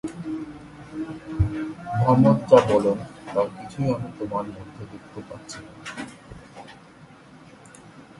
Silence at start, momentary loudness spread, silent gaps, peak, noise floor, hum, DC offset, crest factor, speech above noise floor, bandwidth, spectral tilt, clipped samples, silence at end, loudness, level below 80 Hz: 0.05 s; 25 LU; none; -2 dBFS; -48 dBFS; none; under 0.1%; 24 dB; 26 dB; 11.5 kHz; -7.5 dB/octave; under 0.1%; 0.15 s; -23 LUFS; -44 dBFS